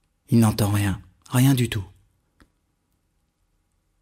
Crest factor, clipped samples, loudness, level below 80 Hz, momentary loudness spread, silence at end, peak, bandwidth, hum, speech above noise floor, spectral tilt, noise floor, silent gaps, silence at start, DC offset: 16 dB; under 0.1%; -22 LUFS; -48 dBFS; 13 LU; 2.15 s; -8 dBFS; 16 kHz; none; 51 dB; -6 dB/octave; -70 dBFS; none; 0.3 s; under 0.1%